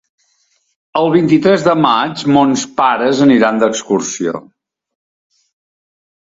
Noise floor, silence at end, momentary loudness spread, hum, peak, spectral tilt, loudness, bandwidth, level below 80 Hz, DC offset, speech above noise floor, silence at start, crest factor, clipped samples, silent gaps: -60 dBFS; 1.8 s; 9 LU; none; 0 dBFS; -5 dB/octave; -13 LUFS; 7.8 kHz; -56 dBFS; under 0.1%; 48 dB; 0.95 s; 14 dB; under 0.1%; none